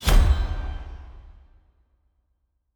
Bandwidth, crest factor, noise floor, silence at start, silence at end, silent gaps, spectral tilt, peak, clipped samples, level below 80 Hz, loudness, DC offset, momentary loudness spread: over 20 kHz; 20 dB; -72 dBFS; 0 s; 1.55 s; none; -5 dB/octave; -6 dBFS; under 0.1%; -24 dBFS; -25 LUFS; under 0.1%; 23 LU